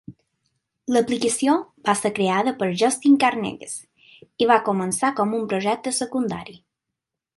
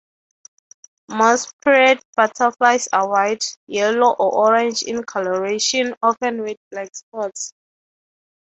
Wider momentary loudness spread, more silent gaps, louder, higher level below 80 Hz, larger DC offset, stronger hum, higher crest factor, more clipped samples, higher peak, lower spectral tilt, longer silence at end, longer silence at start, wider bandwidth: about the same, 13 LU vs 14 LU; second, none vs 1.53-1.59 s, 2.05-2.13 s, 3.57-3.67 s, 5.97-6.01 s, 6.57-6.71 s, 7.03-7.12 s; second, -21 LUFS vs -18 LUFS; about the same, -64 dBFS vs -68 dBFS; neither; neither; about the same, 20 dB vs 18 dB; neither; about the same, -4 dBFS vs -2 dBFS; first, -4 dB/octave vs -2 dB/octave; second, 0.8 s vs 0.95 s; second, 0.1 s vs 1.1 s; first, 11.5 kHz vs 8.4 kHz